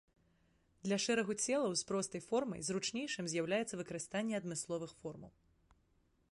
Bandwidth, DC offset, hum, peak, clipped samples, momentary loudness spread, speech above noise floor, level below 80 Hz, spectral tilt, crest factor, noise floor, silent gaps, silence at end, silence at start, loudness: 11.5 kHz; under 0.1%; none; -22 dBFS; under 0.1%; 10 LU; 37 dB; -74 dBFS; -3.5 dB/octave; 18 dB; -75 dBFS; none; 1.05 s; 0.85 s; -38 LUFS